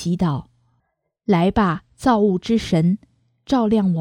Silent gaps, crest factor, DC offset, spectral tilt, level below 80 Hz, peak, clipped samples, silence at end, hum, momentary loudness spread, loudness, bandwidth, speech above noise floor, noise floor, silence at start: none; 16 dB; under 0.1%; -7.5 dB/octave; -44 dBFS; -4 dBFS; under 0.1%; 0 s; none; 6 LU; -19 LUFS; 11 kHz; 53 dB; -71 dBFS; 0 s